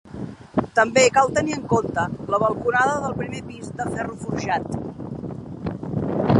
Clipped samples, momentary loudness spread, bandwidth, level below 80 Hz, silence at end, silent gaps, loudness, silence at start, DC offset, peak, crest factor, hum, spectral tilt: under 0.1%; 16 LU; 11.5 kHz; -48 dBFS; 0 s; none; -22 LUFS; 0.05 s; under 0.1%; -2 dBFS; 20 dB; none; -5 dB/octave